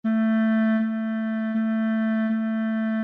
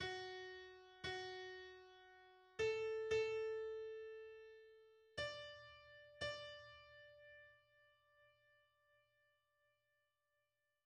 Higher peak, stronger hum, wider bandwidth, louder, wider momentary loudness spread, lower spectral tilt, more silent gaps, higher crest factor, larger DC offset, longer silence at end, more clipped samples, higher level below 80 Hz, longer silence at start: first, -14 dBFS vs -30 dBFS; neither; second, 3.8 kHz vs 9.8 kHz; first, -24 LUFS vs -47 LUFS; second, 5 LU vs 22 LU; first, -9.5 dB/octave vs -3.5 dB/octave; neither; second, 10 dB vs 20 dB; neither; second, 0 s vs 2.6 s; neither; about the same, -80 dBFS vs -76 dBFS; about the same, 0.05 s vs 0 s